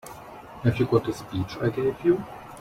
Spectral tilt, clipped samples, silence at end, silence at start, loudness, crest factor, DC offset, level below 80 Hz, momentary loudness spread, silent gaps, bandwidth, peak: -7.5 dB/octave; under 0.1%; 0 s; 0.05 s; -26 LUFS; 20 dB; under 0.1%; -52 dBFS; 18 LU; none; 15.5 kHz; -8 dBFS